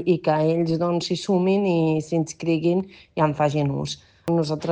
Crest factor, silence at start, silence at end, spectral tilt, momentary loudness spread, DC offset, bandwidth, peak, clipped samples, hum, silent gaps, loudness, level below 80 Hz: 14 dB; 0 s; 0 s; -6.5 dB/octave; 6 LU; under 0.1%; 9.4 kHz; -8 dBFS; under 0.1%; none; none; -23 LUFS; -58 dBFS